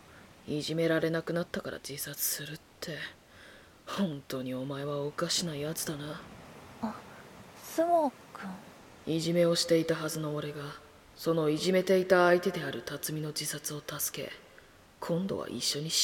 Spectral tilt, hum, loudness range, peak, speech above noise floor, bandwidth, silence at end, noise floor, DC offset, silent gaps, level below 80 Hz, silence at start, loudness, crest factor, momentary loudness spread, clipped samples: -4 dB/octave; none; 7 LU; -10 dBFS; 26 dB; 17.5 kHz; 0 s; -57 dBFS; under 0.1%; none; -66 dBFS; 0.1 s; -31 LUFS; 22 dB; 19 LU; under 0.1%